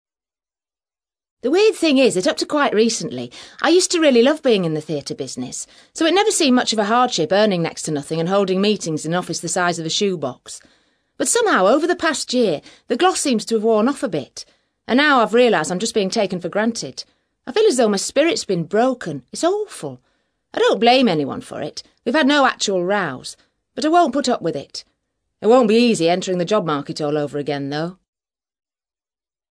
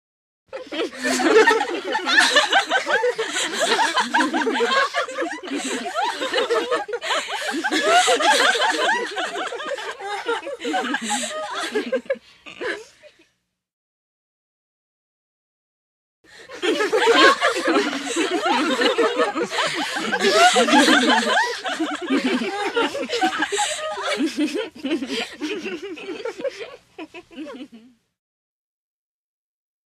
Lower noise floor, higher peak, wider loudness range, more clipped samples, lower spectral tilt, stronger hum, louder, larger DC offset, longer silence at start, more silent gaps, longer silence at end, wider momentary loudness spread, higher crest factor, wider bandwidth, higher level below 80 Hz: first, under -90 dBFS vs -70 dBFS; about the same, -2 dBFS vs 0 dBFS; second, 3 LU vs 14 LU; neither; first, -4 dB/octave vs -1 dB/octave; neither; about the same, -18 LUFS vs -20 LUFS; neither; first, 1.45 s vs 0.5 s; second, none vs 13.73-16.24 s; second, 1.6 s vs 2.1 s; about the same, 14 LU vs 15 LU; about the same, 18 dB vs 22 dB; second, 11 kHz vs 15 kHz; about the same, -64 dBFS vs -68 dBFS